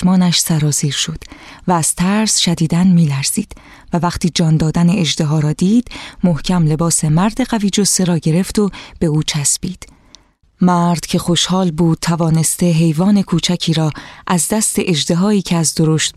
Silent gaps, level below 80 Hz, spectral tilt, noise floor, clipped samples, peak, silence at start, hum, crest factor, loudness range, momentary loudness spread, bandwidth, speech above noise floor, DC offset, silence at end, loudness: none; -38 dBFS; -4.5 dB/octave; -48 dBFS; under 0.1%; -2 dBFS; 0 s; none; 12 dB; 2 LU; 6 LU; 14.5 kHz; 33 dB; under 0.1%; 0.05 s; -14 LUFS